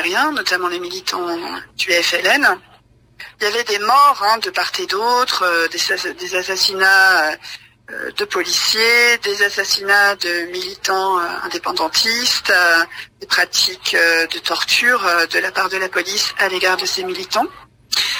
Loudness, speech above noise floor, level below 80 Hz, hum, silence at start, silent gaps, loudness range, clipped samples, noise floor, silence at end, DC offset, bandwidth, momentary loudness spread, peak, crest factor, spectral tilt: -15 LUFS; 34 dB; -58 dBFS; none; 0 s; none; 2 LU; under 0.1%; -50 dBFS; 0 s; under 0.1%; 16 kHz; 11 LU; -2 dBFS; 16 dB; 0 dB/octave